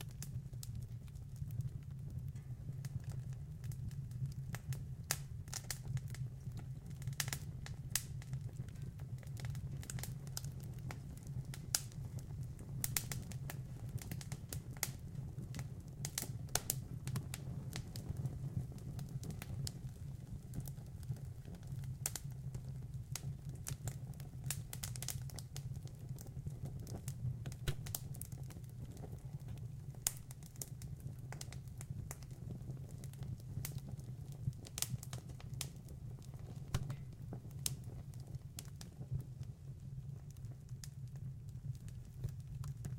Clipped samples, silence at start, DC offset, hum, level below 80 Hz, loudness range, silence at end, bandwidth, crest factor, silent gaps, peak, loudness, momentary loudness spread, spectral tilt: under 0.1%; 0 s; under 0.1%; none; -56 dBFS; 4 LU; 0 s; 16.5 kHz; 36 dB; none; -10 dBFS; -46 LUFS; 9 LU; -4 dB/octave